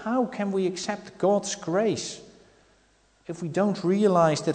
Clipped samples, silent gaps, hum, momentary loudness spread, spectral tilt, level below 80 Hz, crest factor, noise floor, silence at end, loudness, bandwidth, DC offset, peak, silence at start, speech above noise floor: under 0.1%; none; none; 14 LU; -5.5 dB/octave; -66 dBFS; 18 dB; -63 dBFS; 0 s; -26 LUFS; 9.4 kHz; under 0.1%; -8 dBFS; 0 s; 38 dB